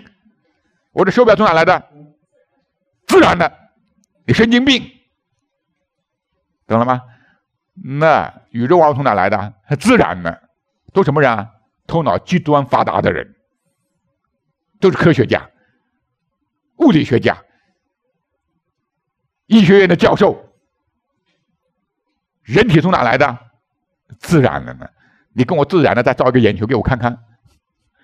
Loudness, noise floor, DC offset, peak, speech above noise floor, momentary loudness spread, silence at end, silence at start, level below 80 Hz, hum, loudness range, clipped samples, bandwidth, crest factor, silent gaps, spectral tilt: -14 LUFS; -74 dBFS; under 0.1%; 0 dBFS; 61 dB; 15 LU; 0.9 s; 0.95 s; -44 dBFS; none; 4 LU; under 0.1%; 15 kHz; 16 dB; none; -6.5 dB/octave